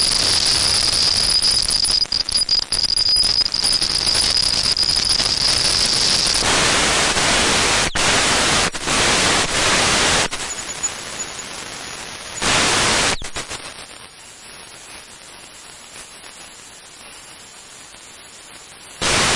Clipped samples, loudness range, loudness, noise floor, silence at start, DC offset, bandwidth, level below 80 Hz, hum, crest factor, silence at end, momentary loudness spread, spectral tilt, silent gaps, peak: under 0.1%; 22 LU; -15 LUFS; -40 dBFS; 0 s; under 0.1%; 11.5 kHz; -38 dBFS; none; 14 dB; 0 s; 22 LU; -1 dB/octave; none; -6 dBFS